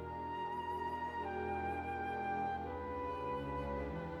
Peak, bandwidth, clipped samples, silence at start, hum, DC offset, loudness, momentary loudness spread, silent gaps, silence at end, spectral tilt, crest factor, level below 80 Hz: -28 dBFS; 13 kHz; under 0.1%; 0 s; none; under 0.1%; -41 LUFS; 3 LU; none; 0 s; -7.5 dB/octave; 12 dB; -54 dBFS